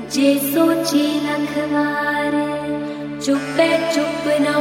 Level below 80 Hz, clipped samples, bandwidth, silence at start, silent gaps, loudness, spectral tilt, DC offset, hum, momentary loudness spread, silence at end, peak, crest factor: -56 dBFS; under 0.1%; 16.5 kHz; 0 s; none; -19 LUFS; -4 dB/octave; under 0.1%; none; 7 LU; 0 s; -2 dBFS; 16 dB